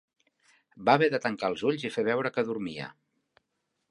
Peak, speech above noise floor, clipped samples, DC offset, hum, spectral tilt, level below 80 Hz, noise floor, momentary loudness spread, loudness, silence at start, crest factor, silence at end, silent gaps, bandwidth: -8 dBFS; 52 dB; under 0.1%; under 0.1%; none; -6 dB/octave; -72 dBFS; -80 dBFS; 13 LU; -28 LUFS; 0.75 s; 22 dB; 1 s; none; 11 kHz